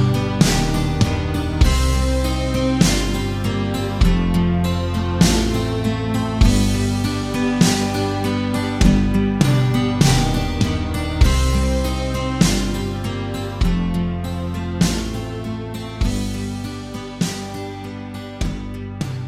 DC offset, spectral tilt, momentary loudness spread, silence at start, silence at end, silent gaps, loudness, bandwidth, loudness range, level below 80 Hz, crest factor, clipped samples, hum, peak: under 0.1%; -5.5 dB/octave; 11 LU; 0 s; 0 s; none; -20 LUFS; 16 kHz; 7 LU; -24 dBFS; 18 dB; under 0.1%; none; 0 dBFS